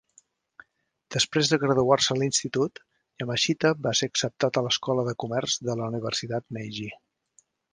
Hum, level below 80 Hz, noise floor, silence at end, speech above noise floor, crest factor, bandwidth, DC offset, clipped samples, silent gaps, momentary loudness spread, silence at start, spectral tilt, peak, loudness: none; -64 dBFS; -69 dBFS; 0.8 s; 43 dB; 22 dB; 10.5 kHz; under 0.1%; under 0.1%; none; 11 LU; 1.1 s; -3.5 dB/octave; -6 dBFS; -26 LUFS